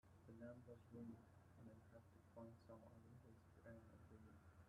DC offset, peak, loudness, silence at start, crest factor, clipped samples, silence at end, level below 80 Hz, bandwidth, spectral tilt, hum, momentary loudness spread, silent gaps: under 0.1%; -46 dBFS; -64 LUFS; 0.05 s; 18 dB; under 0.1%; 0 s; -80 dBFS; 11.5 kHz; -8 dB/octave; none; 8 LU; none